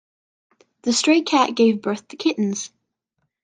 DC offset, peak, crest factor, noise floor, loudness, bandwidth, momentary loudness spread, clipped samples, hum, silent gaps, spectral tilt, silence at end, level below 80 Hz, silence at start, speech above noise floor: under 0.1%; -2 dBFS; 18 dB; -75 dBFS; -20 LUFS; 9.6 kHz; 12 LU; under 0.1%; none; none; -3.5 dB/octave; 0.75 s; -70 dBFS; 0.85 s; 56 dB